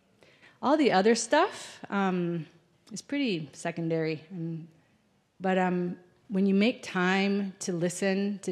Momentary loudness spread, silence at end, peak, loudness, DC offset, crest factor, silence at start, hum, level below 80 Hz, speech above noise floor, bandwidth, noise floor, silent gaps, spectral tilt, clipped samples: 14 LU; 0 s; -10 dBFS; -28 LUFS; under 0.1%; 18 dB; 0.6 s; none; -80 dBFS; 40 dB; 12 kHz; -68 dBFS; none; -5 dB/octave; under 0.1%